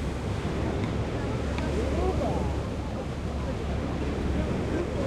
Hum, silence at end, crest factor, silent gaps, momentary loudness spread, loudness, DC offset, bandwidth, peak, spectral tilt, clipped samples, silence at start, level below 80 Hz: none; 0 s; 14 dB; none; 5 LU; -30 LUFS; under 0.1%; 11.5 kHz; -14 dBFS; -7 dB/octave; under 0.1%; 0 s; -34 dBFS